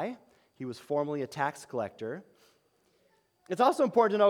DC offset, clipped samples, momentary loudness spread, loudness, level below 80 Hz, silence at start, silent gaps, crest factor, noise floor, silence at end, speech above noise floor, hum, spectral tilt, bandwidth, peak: under 0.1%; under 0.1%; 17 LU; -31 LUFS; -82 dBFS; 0 s; none; 20 dB; -70 dBFS; 0 s; 41 dB; none; -5.5 dB/octave; 16.5 kHz; -12 dBFS